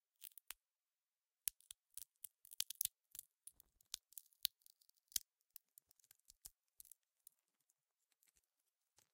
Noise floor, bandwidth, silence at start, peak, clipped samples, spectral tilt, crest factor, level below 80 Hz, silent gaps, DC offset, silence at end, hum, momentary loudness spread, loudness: under -90 dBFS; 17 kHz; 0.2 s; -14 dBFS; under 0.1%; 3.5 dB/octave; 42 dB; -86 dBFS; none; under 0.1%; 2.65 s; none; 24 LU; -48 LUFS